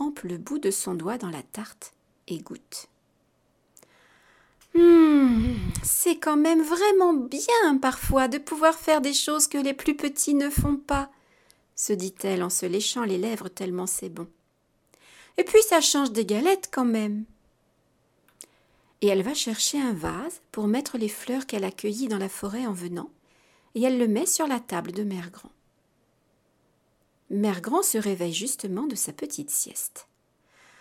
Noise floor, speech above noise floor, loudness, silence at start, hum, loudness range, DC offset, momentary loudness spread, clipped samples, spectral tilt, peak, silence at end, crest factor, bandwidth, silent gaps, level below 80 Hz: -69 dBFS; 45 dB; -24 LUFS; 0 s; none; 9 LU; under 0.1%; 17 LU; under 0.1%; -3.5 dB/octave; -6 dBFS; 0.8 s; 20 dB; 17 kHz; none; -46 dBFS